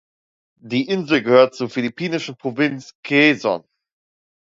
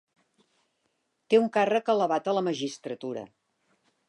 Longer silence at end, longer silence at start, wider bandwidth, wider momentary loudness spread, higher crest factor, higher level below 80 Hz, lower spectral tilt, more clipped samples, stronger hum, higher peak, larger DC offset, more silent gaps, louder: about the same, 0.9 s vs 0.85 s; second, 0.65 s vs 1.3 s; second, 7.8 kHz vs 11 kHz; second, 10 LU vs 13 LU; about the same, 20 dB vs 20 dB; first, -66 dBFS vs -82 dBFS; about the same, -5.5 dB/octave vs -5 dB/octave; neither; neither; first, 0 dBFS vs -10 dBFS; neither; first, 2.95-3.03 s vs none; first, -19 LUFS vs -27 LUFS